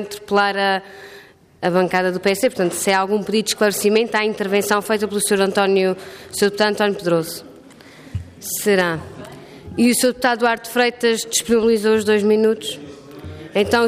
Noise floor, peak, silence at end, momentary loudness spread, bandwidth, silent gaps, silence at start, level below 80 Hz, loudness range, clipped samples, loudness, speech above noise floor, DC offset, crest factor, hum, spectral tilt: -43 dBFS; -4 dBFS; 0 s; 16 LU; 15.5 kHz; none; 0 s; -56 dBFS; 4 LU; under 0.1%; -18 LUFS; 25 dB; under 0.1%; 14 dB; none; -3.5 dB/octave